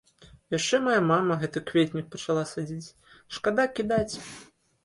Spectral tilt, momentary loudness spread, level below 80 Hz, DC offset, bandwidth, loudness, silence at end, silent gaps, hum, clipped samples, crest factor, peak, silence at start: -5 dB/octave; 17 LU; -58 dBFS; under 0.1%; 11.5 kHz; -27 LUFS; 0.4 s; none; none; under 0.1%; 18 dB; -10 dBFS; 0.2 s